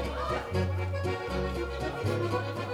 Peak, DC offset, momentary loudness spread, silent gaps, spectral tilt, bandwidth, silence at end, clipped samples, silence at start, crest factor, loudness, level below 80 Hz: -18 dBFS; under 0.1%; 3 LU; none; -6.5 dB/octave; 14 kHz; 0 s; under 0.1%; 0 s; 14 dB; -32 LUFS; -42 dBFS